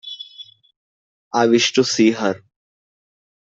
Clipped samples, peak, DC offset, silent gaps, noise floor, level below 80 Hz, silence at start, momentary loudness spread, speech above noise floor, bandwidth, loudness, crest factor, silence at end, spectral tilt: under 0.1%; -4 dBFS; under 0.1%; 0.76-1.31 s; -43 dBFS; -66 dBFS; 0.05 s; 18 LU; 27 dB; 7.8 kHz; -17 LUFS; 18 dB; 1.1 s; -3.5 dB/octave